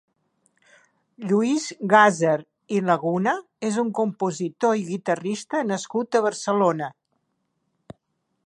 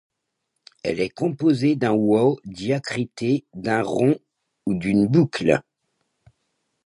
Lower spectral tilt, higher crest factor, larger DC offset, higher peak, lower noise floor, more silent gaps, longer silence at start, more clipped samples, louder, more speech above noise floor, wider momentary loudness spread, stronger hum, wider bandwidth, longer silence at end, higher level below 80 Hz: second, -5 dB/octave vs -7 dB/octave; about the same, 22 dB vs 20 dB; neither; about the same, -2 dBFS vs -4 dBFS; second, -74 dBFS vs -78 dBFS; neither; first, 1.2 s vs 0.85 s; neither; about the same, -23 LUFS vs -22 LUFS; second, 52 dB vs 57 dB; about the same, 9 LU vs 9 LU; neither; about the same, 11 kHz vs 11 kHz; first, 1.55 s vs 1.25 s; second, -74 dBFS vs -56 dBFS